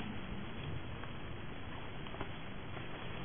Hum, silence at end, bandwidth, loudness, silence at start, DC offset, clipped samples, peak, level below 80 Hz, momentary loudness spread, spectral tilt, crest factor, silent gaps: none; 0 s; 3.6 kHz; -46 LUFS; 0 s; 0.5%; under 0.1%; -26 dBFS; -54 dBFS; 2 LU; -4.5 dB/octave; 18 dB; none